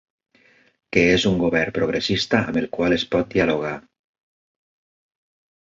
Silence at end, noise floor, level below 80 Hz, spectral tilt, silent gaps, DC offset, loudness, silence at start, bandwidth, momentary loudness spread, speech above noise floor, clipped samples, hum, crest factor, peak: 1.95 s; -57 dBFS; -48 dBFS; -5.5 dB/octave; none; under 0.1%; -20 LUFS; 0.9 s; 7.8 kHz; 7 LU; 37 dB; under 0.1%; none; 20 dB; -2 dBFS